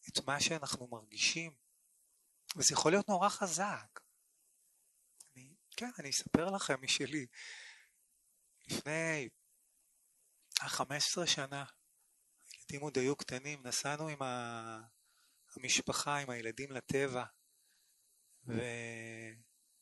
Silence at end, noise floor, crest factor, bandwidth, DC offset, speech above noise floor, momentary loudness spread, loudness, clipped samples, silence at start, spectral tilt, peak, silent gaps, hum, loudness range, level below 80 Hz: 0.4 s; -75 dBFS; 32 dB; 12 kHz; under 0.1%; 37 dB; 17 LU; -36 LUFS; under 0.1%; 0.05 s; -2.5 dB/octave; -8 dBFS; none; none; 7 LU; -72 dBFS